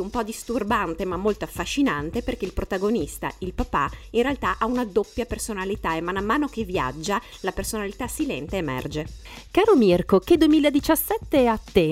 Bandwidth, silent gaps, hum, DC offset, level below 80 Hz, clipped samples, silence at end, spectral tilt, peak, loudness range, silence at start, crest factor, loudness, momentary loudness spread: 16 kHz; none; none; under 0.1%; -40 dBFS; under 0.1%; 0 s; -5 dB/octave; -4 dBFS; 6 LU; 0 s; 18 dB; -24 LUFS; 11 LU